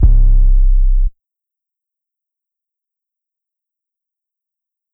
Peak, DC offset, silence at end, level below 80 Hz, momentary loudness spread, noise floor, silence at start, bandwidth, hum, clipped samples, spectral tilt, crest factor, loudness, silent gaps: 0 dBFS; under 0.1%; 3.85 s; -14 dBFS; 8 LU; -84 dBFS; 0 s; 0.8 kHz; none; under 0.1%; -13 dB/octave; 14 dB; -16 LUFS; none